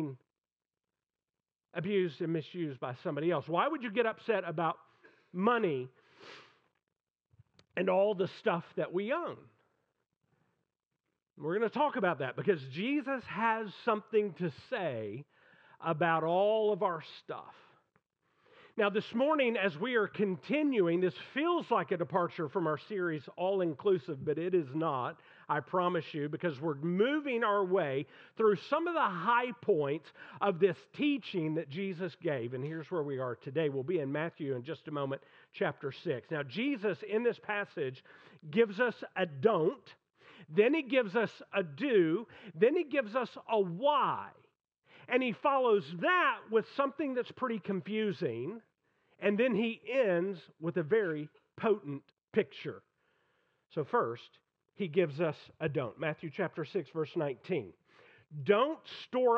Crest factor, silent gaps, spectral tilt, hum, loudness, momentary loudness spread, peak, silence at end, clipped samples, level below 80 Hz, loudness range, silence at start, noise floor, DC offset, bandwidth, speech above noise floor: 20 dB; none; -8 dB/octave; none; -33 LUFS; 11 LU; -12 dBFS; 0 s; under 0.1%; -86 dBFS; 5 LU; 0 s; under -90 dBFS; under 0.1%; 6.8 kHz; over 57 dB